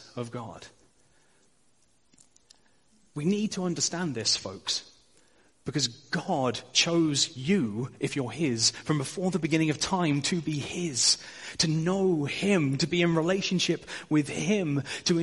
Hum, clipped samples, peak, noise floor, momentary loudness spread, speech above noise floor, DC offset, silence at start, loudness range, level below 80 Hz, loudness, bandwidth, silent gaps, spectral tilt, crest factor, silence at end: none; under 0.1%; -8 dBFS; -68 dBFS; 9 LU; 41 dB; under 0.1%; 0 s; 7 LU; -64 dBFS; -27 LUFS; 11.5 kHz; none; -4 dB/octave; 20 dB; 0 s